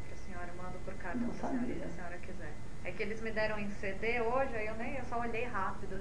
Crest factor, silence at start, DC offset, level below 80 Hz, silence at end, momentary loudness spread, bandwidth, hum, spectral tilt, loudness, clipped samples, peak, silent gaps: 18 dB; 0 s; 2%; -50 dBFS; 0 s; 11 LU; 10.5 kHz; none; -6 dB/octave; -39 LUFS; under 0.1%; -18 dBFS; none